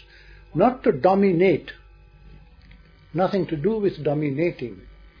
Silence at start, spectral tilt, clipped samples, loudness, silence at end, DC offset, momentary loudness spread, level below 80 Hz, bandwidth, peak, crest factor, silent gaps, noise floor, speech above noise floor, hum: 0.55 s; -9.5 dB/octave; under 0.1%; -22 LUFS; 0.3 s; under 0.1%; 14 LU; -50 dBFS; 5.4 kHz; -4 dBFS; 20 dB; none; -49 dBFS; 28 dB; none